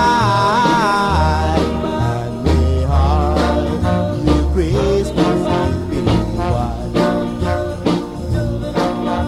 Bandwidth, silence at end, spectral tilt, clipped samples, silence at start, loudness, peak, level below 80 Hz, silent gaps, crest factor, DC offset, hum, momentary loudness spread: 12.5 kHz; 0 s; -7 dB/octave; under 0.1%; 0 s; -17 LUFS; -2 dBFS; -22 dBFS; none; 14 dB; under 0.1%; none; 6 LU